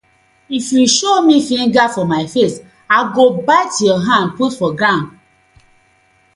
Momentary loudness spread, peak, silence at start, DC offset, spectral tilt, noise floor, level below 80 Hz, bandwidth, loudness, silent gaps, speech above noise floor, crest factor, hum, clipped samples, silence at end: 7 LU; 0 dBFS; 0.5 s; under 0.1%; -4 dB/octave; -55 dBFS; -56 dBFS; 11.5 kHz; -13 LUFS; none; 41 dB; 14 dB; none; under 0.1%; 1.25 s